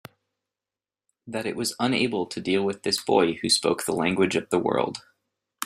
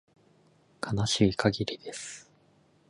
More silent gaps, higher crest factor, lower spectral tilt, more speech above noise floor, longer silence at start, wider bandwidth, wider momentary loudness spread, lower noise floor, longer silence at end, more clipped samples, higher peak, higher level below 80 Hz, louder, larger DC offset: neither; about the same, 20 dB vs 22 dB; about the same, -3.5 dB/octave vs -4.5 dB/octave; first, over 66 dB vs 36 dB; first, 1.25 s vs 0.8 s; first, 16 kHz vs 11.5 kHz; second, 9 LU vs 16 LU; first, under -90 dBFS vs -64 dBFS; second, 0 s vs 0.7 s; neither; first, -6 dBFS vs -10 dBFS; second, -64 dBFS vs -54 dBFS; first, -24 LUFS vs -29 LUFS; neither